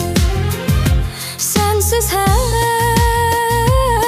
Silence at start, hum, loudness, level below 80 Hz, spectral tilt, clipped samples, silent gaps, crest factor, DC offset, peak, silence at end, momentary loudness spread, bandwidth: 0 s; none; -15 LUFS; -20 dBFS; -4.5 dB/octave; under 0.1%; none; 12 dB; under 0.1%; -2 dBFS; 0 s; 4 LU; 16 kHz